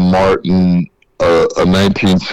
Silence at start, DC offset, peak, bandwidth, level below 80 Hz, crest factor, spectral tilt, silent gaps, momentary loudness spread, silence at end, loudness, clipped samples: 0 s; under 0.1%; -6 dBFS; 11 kHz; -36 dBFS; 6 dB; -6.5 dB/octave; none; 5 LU; 0 s; -12 LUFS; under 0.1%